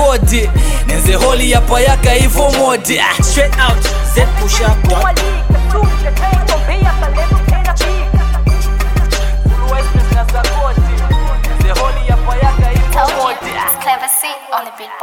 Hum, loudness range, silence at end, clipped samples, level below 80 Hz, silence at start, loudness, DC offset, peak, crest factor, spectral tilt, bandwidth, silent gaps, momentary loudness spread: none; 3 LU; 0 s; under 0.1%; -12 dBFS; 0 s; -13 LUFS; under 0.1%; 0 dBFS; 10 dB; -4.5 dB/octave; 17.5 kHz; none; 5 LU